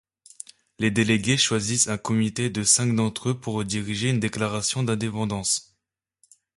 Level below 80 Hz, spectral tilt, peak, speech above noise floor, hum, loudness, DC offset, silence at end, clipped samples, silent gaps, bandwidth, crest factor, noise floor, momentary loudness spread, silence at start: -56 dBFS; -3.5 dB/octave; -6 dBFS; 56 dB; none; -23 LUFS; under 0.1%; 0.95 s; under 0.1%; none; 11.5 kHz; 20 dB; -80 dBFS; 9 LU; 0.8 s